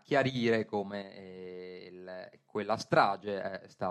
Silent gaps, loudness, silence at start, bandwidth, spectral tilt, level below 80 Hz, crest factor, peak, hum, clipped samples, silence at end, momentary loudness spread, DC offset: none; -32 LUFS; 0.1 s; 12 kHz; -6 dB/octave; -76 dBFS; 22 dB; -12 dBFS; none; under 0.1%; 0 s; 19 LU; under 0.1%